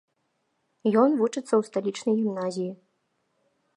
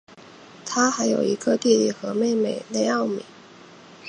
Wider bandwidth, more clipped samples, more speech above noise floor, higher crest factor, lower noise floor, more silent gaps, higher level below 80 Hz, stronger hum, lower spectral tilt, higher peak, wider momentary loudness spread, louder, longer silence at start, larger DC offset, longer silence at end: about the same, 11 kHz vs 10 kHz; neither; first, 50 dB vs 25 dB; about the same, 20 dB vs 18 dB; first, -75 dBFS vs -47 dBFS; neither; second, -84 dBFS vs -72 dBFS; neither; first, -6 dB/octave vs -4 dB/octave; second, -8 dBFS vs -4 dBFS; about the same, 9 LU vs 8 LU; second, -26 LUFS vs -22 LUFS; first, 0.85 s vs 0.15 s; neither; first, 1 s vs 0 s